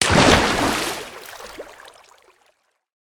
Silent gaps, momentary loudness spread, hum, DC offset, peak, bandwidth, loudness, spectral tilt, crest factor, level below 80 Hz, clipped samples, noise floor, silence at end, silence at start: none; 24 LU; none; under 0.1%; 0 dBFS; over 20 kHz; -17 LUFS; -3.5 dB/octave; 22 dB; -38 dBFS; under 0.1%; -64 dBFS; 1.4 s; 0 s